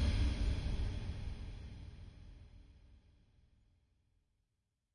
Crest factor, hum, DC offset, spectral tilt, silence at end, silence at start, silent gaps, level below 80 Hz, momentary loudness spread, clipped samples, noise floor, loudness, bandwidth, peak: 18 dB; none; under 0.1%; -6.5 dB/octave; 2 s; 0 s; none; -44 dBFS; 23 LU; under 0.1%; -86 dBFS; -41 LUFS; 10.5 kHz; -24 dBFS